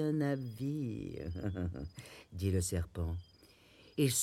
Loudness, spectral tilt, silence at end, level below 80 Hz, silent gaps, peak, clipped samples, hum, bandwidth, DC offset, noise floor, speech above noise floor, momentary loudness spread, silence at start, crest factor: -38 LUFS; -5 dB/octave; 0 s; -56 dBFS; none; -20 dBFS; under 0.1%; none; 16.5 kHz; under 0.1%; -62 dBFS; 26 dB; 12 LU; 0 s; 18 dB